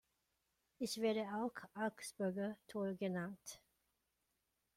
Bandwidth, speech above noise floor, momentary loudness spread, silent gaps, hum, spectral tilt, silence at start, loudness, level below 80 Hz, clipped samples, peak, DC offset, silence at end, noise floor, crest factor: 16.5 kHz; 44 dB; 10 LU; none; none; -5 dB/octave; 0.8 s; -43 LUFS; -82 dBFS; under 0.1%; -28 dBFS; under 0.1%; 1.2 s; -86 dBFS; 18 dB